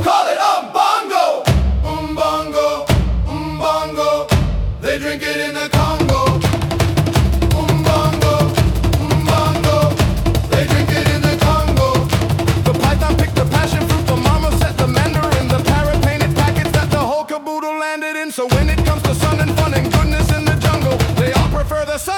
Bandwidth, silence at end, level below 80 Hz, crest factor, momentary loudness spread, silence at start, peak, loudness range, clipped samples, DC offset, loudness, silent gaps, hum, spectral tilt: 18 kHz; 0 s; -24 dBFS; 12 dB; 5 LU; 0 s; -2 dBFS; 2 LU; under 0.1%; under 0.1%; -16 LUFS; none; none; -5.5 dB/octave